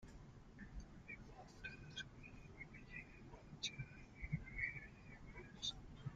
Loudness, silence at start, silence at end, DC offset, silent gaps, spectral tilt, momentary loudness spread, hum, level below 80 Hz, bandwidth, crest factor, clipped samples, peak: -52 LUFS; 0 s; 0 s; under 0.1%; none; -3.5 dB/octave; 14 LU; none; -62 dBFS; 9 kHz; 22 dB; under 0.1%; -30 dBFS